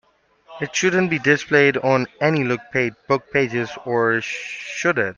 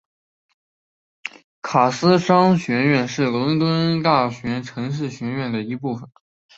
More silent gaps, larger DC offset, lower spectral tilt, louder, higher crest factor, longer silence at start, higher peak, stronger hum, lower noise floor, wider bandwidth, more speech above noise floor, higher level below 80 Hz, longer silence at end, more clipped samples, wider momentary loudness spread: second, none vs 1.44-1.62 s; neither; second, -5 dB/octave vs -6.5 dB/octave; about the same, -20 LUFS vs -20 LUFS; about the same, 18 dB vs 20 dB; second, 0.5 s vs 1.25 s; about the same, -2 dBFS vs 0 dBFS; neither; second, -52 dBFS vs under -90 dBFS; about the same, 7.4 kHz vs 8 kHz; second, 32 dB vs over 71 dB; about the same, -60 dBFS vs -58 dBFS; second, 0.05 s vs 0.5 s; neither; second, 9 LU vs 17 LU